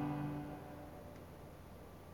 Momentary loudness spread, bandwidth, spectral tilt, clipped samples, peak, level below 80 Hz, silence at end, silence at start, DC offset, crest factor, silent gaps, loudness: 13 LU; 19 kHz; -7.5 dB/octave; under 0.1%; -30 dBFS; -64 dBFS; 0 s; 0 s; under 0.1%; 16 dB; none; -49 LUFS